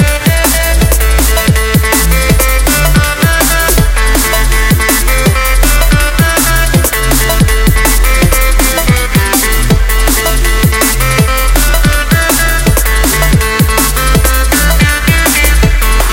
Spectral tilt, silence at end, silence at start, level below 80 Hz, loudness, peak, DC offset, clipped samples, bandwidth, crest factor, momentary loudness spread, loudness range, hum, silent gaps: -3.5 dB/octave; 0 s; 0 s; -10 dBFS; -9 LUFS; 0 dBFS; under 0.1%; 0.1%; 17.5 kHz; 8 dB; 2 LU; 1 LU; none; none